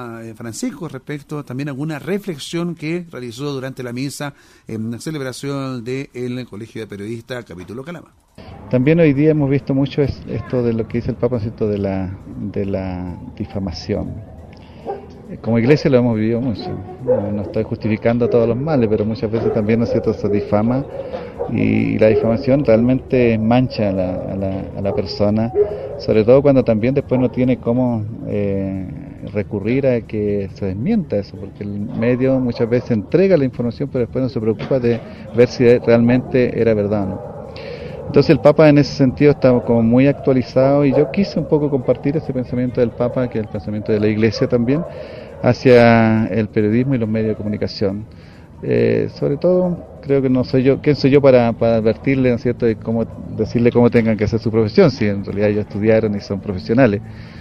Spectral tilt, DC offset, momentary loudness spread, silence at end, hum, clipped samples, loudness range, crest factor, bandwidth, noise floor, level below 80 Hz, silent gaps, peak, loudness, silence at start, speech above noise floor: -8 dB/octave; under 0.1%; 15 LU; 0 s; none; under 0.1%; 10 LU; 16 dB; 12.5 kHz; -37 dBFS; -42 dBFS; none; 0 dBFS; -17 LUFS; 0 s; 21 dB